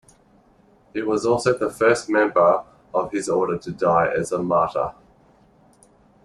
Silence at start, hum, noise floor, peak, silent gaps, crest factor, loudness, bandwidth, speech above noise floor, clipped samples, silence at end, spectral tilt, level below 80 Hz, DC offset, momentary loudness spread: 0.95 s; none; -56 dBFS; -4 dBFS; none; 18 dB; -21 LUFS; 12.5 kHz; 36 dB; under 0.1%; 1.35 s; -5.5 dB/octave; -56 dBFS; under 0.1%; 9 LU